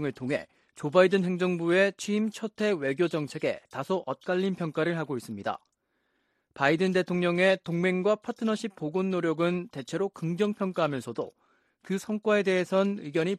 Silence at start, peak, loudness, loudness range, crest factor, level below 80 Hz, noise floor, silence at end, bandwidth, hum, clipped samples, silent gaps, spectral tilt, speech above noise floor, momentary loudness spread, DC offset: 0 s; -8 dBFS; -28 LUFS; 4 LU; 20 dB; -72 dBFS; -75 dBFS; 0 s; 13 kHz; none; under 0.1%; none; -6 dB/octave; 48 dB; 10 LU; under 0.1%